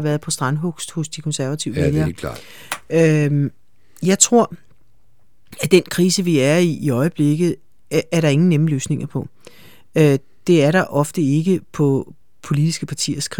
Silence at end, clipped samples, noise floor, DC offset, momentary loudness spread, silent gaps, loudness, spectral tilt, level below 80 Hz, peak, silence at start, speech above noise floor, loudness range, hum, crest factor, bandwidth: 0.05 s; under 0.1%; -62 dBFS; 0.7%; 11 LU; none; -18 LUFS; -5.5 dB/octave; -48 dBFS; 0 dBFS; 0 s; 44 dB; 3 LU; none; 18 dB; 18.5 kHz